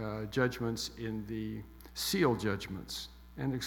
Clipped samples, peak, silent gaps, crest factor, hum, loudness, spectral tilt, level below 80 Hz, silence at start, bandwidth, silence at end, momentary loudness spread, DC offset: under 0.1%; -16 dBFS; none; 20 dB; none; -35 LUFS; -5 dB/octave; -54 dBFS; 0 s; 18 kHz; 0 s; 12 LU; under 0.1%